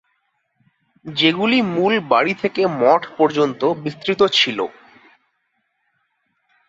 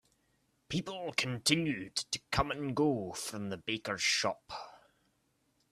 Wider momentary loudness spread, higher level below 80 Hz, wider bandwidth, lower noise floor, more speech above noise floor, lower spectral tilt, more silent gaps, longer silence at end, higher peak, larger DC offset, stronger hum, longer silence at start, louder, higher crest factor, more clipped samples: about the same, 9 LU vs 10 LU; second, -64 dBFS vs -58 dBFS; second, 7.8 kHz vs 15 kHz; second, -70 dBFS vs -76 dBFS; first, 52 dB vs 41 dB; first, -5 dB/octave vs -3.5 dB/octave; neither; first, 2 s vs 0.95 s; first, -2 dBFS vs -14 dBFS; neither; neither; first, 1.05 s vs 0.7 s; first, -17 LUFS vs -34 LUFS; about the same, 18 dB vs 22 dB; neither